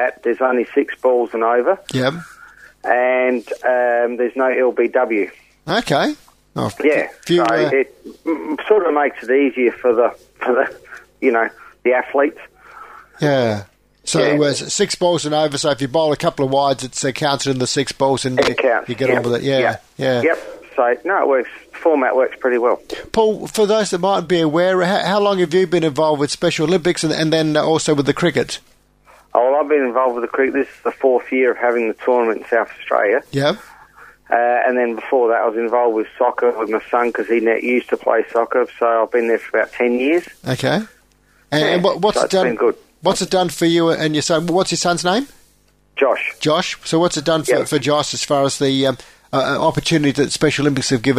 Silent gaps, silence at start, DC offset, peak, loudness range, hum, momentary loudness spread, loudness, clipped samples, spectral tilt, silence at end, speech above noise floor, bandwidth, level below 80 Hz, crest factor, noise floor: none; 0 s; under 0.1%; 0 dBFS; 2 LU; none; 6 LU; -17 LUFS; under 0.1%; -4.5 dB/octave; 0 s; 39 dB; 15.5 kHz; -52 dBFS; 18 dB; -56 dBFS